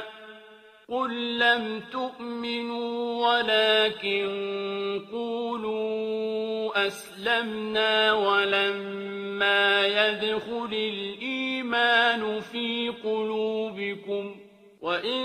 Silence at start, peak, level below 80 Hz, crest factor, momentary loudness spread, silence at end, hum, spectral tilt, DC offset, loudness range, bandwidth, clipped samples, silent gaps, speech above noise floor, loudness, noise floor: 0 s; -6 dBFS; -72 dBFS; 20 dB; 12 LU; 0 s; none; -4 dB/octave; under 0.1%; 5 LU; 14.5 kHz; under 0.1%; none; 25 dB; -26 LUFS; -51 dBFS